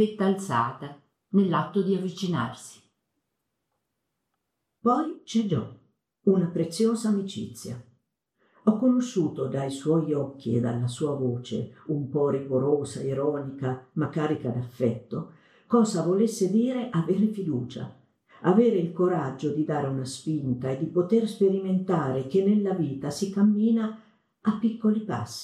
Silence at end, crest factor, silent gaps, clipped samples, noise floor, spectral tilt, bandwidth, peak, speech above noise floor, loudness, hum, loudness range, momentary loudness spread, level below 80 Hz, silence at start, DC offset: 0 s; 18 dB; none; under 0.1%; -81 dBFS; -7 dB/octave; 13 kHz; -8 dBFS; 55 dB; -26 LUFS; none; 4 LU; 10 LU; -68 dBFS; 0 s; under 0.1%